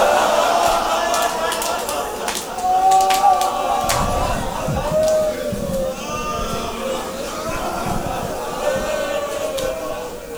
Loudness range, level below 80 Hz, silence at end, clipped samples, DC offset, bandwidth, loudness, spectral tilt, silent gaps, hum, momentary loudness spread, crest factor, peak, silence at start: 6 LU; -36 dBFS; 0 s; under 0.1%; under 0.1%; over 20 kHz; -20 LUFS; -3.5 dB/octave; none; none; 10 LU; 16 dB; -2 dBFS; 0 s